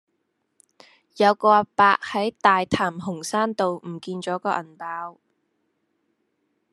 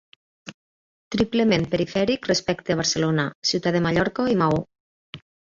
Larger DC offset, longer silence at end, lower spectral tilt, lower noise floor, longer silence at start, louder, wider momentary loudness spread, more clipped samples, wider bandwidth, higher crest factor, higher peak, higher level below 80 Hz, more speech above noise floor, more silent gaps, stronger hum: neither; first, 1.6 s vs 0.3 s; about the same, -4.5 dB/octave vs -5 dB/octave; second, -74 dBFS vs under -90 dBFS; first, 1.15 s vs 0.45 s; about the same, -22 LUFS vs -22 LUFS; second, 14 LU vs 22 LU; neither; first, 12.5 kHz vs 7.8 kHz; first, 22 dB vs 16 dB; first, -2 dBFS vs -8 dBFS; second, -62 dBFS vs -52 dBFS; second, 52 dB vs over 68 dB; second, none vs 0.54-1.11 s, 3.35-3.42 s, 4.80-5.13 s; neither